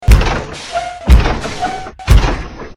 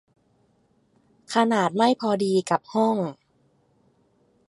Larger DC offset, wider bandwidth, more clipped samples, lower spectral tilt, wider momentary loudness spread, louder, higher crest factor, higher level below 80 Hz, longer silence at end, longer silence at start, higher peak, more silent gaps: neither; first, 15.5 kHz vs 11.5 kHz; first, 1% vs under 0.1%; about the same, -5.5 dB/octave vs -5.5 dB/octave; first, 10 LU vs 6 LU; first, -15 LUFS vs -23 LUFS; second, 12 dB vs 20 dB; first, -14 dBFS vs -74 dBFS; second, 0.05 s vs 1.35 s; second, 0 s vs 1.3 s; first, 0 dBFS vs -6 dBFS; neither